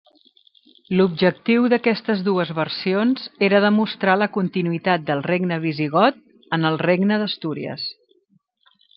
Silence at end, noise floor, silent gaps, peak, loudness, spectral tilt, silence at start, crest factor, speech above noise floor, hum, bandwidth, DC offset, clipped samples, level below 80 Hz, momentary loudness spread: 1.05 s; -63 dBFS; none; -2 dBFS; -20 LUFS; -10 dB/octave; 0.9 s; 18 dB; 43 dB; none; 5.6 kHz; under 0.1%; under 0.1%; -66 dBFS; 8 LU